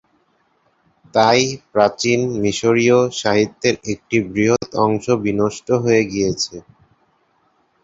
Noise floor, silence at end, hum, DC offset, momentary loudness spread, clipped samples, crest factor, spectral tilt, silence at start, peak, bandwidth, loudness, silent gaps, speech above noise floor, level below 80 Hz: -62 dBFS; 1.25 s; none; under 0.1%; 6 LU; under 0.1%; 18 dB; -4.5 dB/octave; 1.15 s; 0 dBFS; 8 kHz; -17 LUFS; none; 45 dB; -52 dBFS